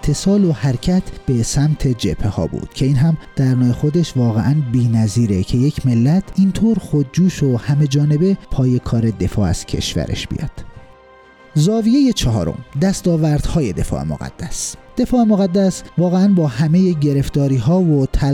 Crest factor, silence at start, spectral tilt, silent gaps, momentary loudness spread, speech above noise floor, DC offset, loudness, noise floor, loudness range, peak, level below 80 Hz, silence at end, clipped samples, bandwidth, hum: 10 dB; 0 s; -7 dB/octave; none; 8 LU; 29 dB; under 0.1%; -17 LUFS; -44 dBFS; 3 LU; -6 dBFS; -32 dBFS; 0 s; under 0.1%; 14.5 kHz; none